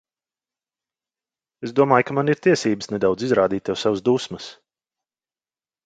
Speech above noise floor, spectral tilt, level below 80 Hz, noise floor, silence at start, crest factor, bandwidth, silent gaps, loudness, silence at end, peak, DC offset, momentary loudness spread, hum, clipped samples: over 70 dB; -5.5 dB/octave; -60 dBFS; under -90 dBFS; 1.6 s; 22 dB; 9.2 kHz; none; -20 LUFS; 1.35 s; 0 dBFS; under 0.1%; 14 LU; none; under 0.1%